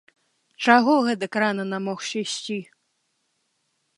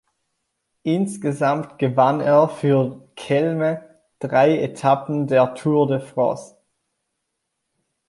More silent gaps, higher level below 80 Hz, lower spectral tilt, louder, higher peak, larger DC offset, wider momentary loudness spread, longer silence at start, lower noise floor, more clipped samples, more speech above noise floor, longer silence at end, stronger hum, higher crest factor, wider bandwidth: neither; second, -78 dBFS vs -66 dBFS; second, -4 dB/octave vs -7.5 dB/octave; about the same, -22 LUFS vs -20 LUFS; about the same, 0 dBFS vs -2 dBFS; neither; first, 12 LU vs 8 LU; second, 0.6 s vs 0.85 s; second, -73 dBFS vs -77 dBFS; neither; second, 51 dB vs 58 dB; second, 1.35 s vs 1.65 s; neither; first, 24 dB vs 18 dB; about the same, 11.5 kHz vs 11.5 kHz